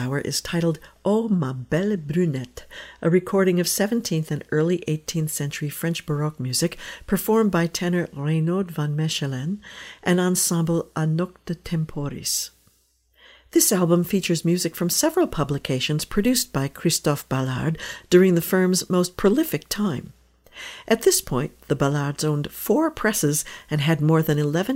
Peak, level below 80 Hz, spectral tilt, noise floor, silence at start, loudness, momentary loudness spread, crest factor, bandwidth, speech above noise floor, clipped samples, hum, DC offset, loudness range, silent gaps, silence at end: -2 dBFS; -48 dBFS; -5 dB/octave; -63 dBFS; 0 s; -22 LUFS; 8 LU; 20 dB; 16.5 kHz; 41 dB; under 0.1%; none; under 0.1%; 3 LU; none; 0 s